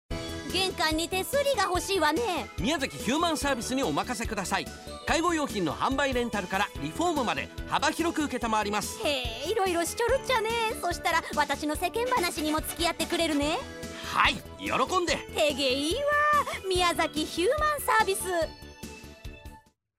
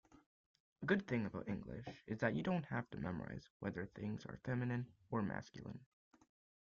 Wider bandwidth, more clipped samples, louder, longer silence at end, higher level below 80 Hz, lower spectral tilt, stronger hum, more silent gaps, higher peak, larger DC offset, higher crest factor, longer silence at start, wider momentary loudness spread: first, 16 kHz vs 7.2 kHz; neither; first, -27 LUFS vs -43 LUFS; second, 0.4 s vs 0.8 s; first, -46 dBFS vs -70 dBFS; second, -3 dB/octave vs -6.5 dB/octave; neither; second, none vs 3.50-3.60 s; first, -8 dBFS vs -22 dBFS; neither; about the same, 22 dB vs 22 dB; second, 0.1 s vs 0.8 s; second, 7 LU vs 13 LU